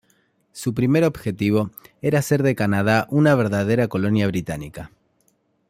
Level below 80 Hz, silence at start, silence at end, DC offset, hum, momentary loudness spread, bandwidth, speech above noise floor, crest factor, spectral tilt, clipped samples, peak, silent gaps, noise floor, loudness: -52 dBFS; 0.55 s; 0.85 s; under 0.1%; none; 13 LU; 16 kHz; 45 dB; 18 dB; -7 dB/octave; under 0.1%; -4 dBFS; none; -65 dBFS; -20 LUFS